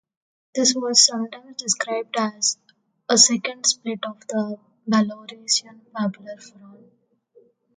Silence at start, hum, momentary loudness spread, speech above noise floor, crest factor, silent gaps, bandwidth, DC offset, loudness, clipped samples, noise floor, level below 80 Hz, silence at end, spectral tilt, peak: 0.55 s; none; 20 LU; 35 dB; 24 dB; none; 11 kHz; under 0.1%; -20 LUFS; under 0.1%; -57 dBFS; -74 dBFS; 1.05 s; -1.5 dB/octave; 0 dBFS